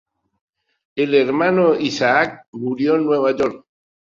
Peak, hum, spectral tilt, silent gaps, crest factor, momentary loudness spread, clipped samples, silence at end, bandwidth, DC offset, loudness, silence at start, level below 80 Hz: -2 dBFS; none; -5.5 dB/octave; 2.48-2.53 s; 18 dB; 8 LU; under 0.1%; 0.45 s; 7.4 kHz; under 0.1%; -18 LUFS; 0.95 s; -60 dBFS